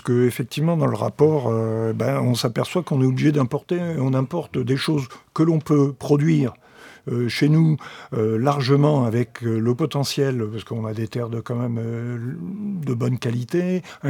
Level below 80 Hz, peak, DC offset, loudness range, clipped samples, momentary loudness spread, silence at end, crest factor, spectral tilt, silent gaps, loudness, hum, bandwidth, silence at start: -62 dBFS; -4 dBFS; under 0.1%; 5 LU; under 0.1%; 10 LU; 0 s; 18 dB; -7 dB/octave; none; -22 LUFS; none; 17.5 kHz; 0.05 s